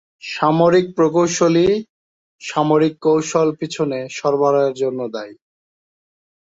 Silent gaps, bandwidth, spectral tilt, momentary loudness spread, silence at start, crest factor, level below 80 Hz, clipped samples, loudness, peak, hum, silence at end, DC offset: 1.89-2.39 s; 8 kHz; -5.5 dB/octave; 12 LU; 0.25 s; 18 dB; -56 dBFS; under 0.1%; -17 LUFS; 0 dBFS; none; 1.15 s; under 0.1%